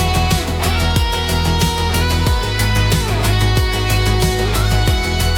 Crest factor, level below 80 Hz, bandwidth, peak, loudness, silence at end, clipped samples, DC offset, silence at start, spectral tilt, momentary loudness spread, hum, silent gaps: 14 dB; -20 dBFS; 18 kHz; -2 dBFS; -16 LUFS; 0 s; under 0.1%; under 0.1%; 0 s; -4.5 dB/octave; 2 LU; none; none